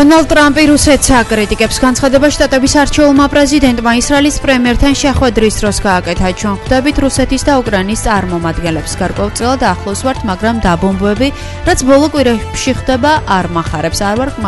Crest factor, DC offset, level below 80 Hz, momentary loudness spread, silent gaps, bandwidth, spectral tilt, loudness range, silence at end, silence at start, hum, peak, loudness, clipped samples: 10 dB; under 0.1%; -22 dBFS; 8 LU; none; 12 kHz; -4.5 dB/octave; 5 LU; 0 s; 0 s; none; 0 dBFS; -11 LUFS; 0.2%